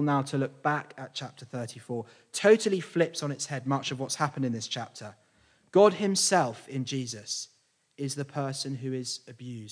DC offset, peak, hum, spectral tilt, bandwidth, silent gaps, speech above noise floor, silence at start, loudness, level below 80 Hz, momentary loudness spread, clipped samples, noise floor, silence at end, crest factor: under 0.1%; -8 dBFS; none; -4.5 dB/octave; 10.5 kHz; none; 36 dB; 0 s; -29 LUFS; -80 dBFS; 16 LU; under 0.1%; -65 dBFS; 0 s; 22 dB